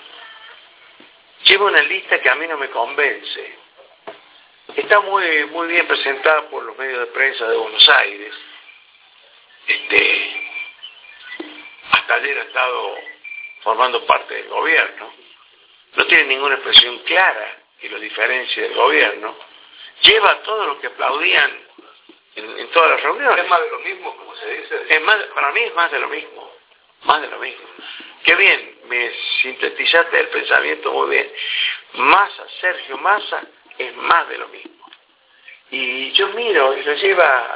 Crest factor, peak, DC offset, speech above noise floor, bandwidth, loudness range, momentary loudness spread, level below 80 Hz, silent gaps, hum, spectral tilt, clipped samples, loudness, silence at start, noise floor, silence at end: 18 dB; 0 dBFS; under 0.1%; 36 dB; 4 kHz; 6 LU; 20 LU; -62 dBFS; none; none; -4 dB/octave; under 0.1%; -15 LUFS; 0.15 s; -53 dBFS; 0 s